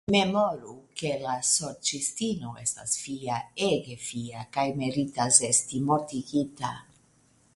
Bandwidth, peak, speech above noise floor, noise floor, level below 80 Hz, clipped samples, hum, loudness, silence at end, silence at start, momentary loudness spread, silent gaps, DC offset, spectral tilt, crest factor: 11.5 kHz; -4 dBFS; 35 dB; -63 dBFS; -62 dBFS; under 0.1%; none; -27 LUFS; 0.75 s; 0.1 s; 14 LU; none; under 0.1%; -3 dB/octave; 24 dB